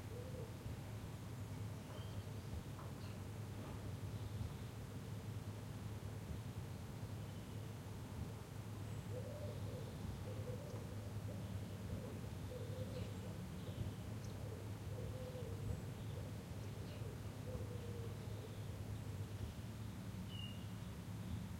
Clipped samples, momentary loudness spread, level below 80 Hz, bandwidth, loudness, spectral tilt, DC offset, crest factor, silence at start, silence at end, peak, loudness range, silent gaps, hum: under 0.1%; 3 LU; -60 dBFS; 16.5 kHz; -49 LUFS; -6.5 dB/octave; under 0.1%; 16 dB; 0 s; 0 s; -32 dBFS; 2 LU; none; none